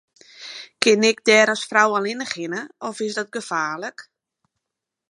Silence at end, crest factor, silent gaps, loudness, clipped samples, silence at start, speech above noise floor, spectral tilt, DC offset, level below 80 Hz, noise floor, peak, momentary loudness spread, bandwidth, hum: 1.1 s; 22 dB; none; -20 LUFS; under 0.1%; 0.4 s; 63 dB; -2.5 dB/octave; under 0.1%; -72 dBFS; -84 dBFS; 0 dBFS; 19 LU; 11.5 kHz; none